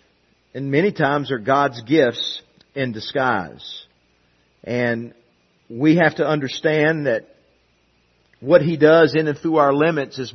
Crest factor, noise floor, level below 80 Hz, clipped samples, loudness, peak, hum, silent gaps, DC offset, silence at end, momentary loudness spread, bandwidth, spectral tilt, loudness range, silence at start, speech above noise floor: 20 dB; -61 dBFS; -62 dBFS; under 0.1%; -18 LUFS; 0 dBFS; none; none; under 0.1%; 0.05 s; 19 LU; 6.4 kHz; -6.5 dB/octave; 7 LU; 0.55 s; 43 dB